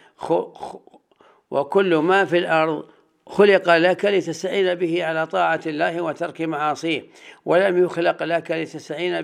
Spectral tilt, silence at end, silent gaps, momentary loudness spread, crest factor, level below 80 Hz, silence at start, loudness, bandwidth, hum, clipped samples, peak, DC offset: -5.5 dB/octave; 0 s; none; 11 LU; 20 dB; -72 dBFS; 0.2 s; -20 LUFS; 11 kHz; none; under 0.1%; -2 dBFS; under 0.1%